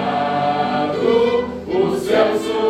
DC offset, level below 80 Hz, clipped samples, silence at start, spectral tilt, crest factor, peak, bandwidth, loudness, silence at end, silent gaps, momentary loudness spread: under 0.1%; -50 dBFS; under 0.1%; 0 s; -5.5 dB/octave; 14 dB; -4 dBFS; 14.5 kHz; -18 LUFS; 0 s; none; 4 LU